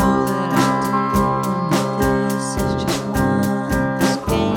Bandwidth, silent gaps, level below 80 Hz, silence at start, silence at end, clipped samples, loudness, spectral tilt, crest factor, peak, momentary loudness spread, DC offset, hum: over 20 kHz; none; -34 dBFS; 0 s; 0 s; under 0.1%; -19 LUFS; -5.5 dB/octave; 14 dB; -4 dBFS; 3 LU; under 0.1%; none